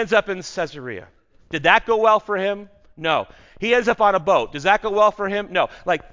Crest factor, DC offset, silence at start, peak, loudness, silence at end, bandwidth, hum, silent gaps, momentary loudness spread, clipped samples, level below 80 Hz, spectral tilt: 20 dB; under 0.1%; 0 s; 0 dBFS; -20 LUFS; 0.15 s; 7.6 kHz; none; none; 13 LU; under 0.1%; -52 dBFS; -4 dB/octave